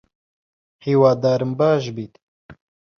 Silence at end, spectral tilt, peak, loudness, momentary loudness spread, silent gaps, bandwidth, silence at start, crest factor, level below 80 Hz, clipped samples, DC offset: 0.45 s; -7.5 dB/octave; -4 dBFS; -18 LUFS; 17 LU; 2.23-2.49 s; 6.8 kHz; 0.85 s; 18 dB; -60 dBFS; under 0.1%; under 0.1%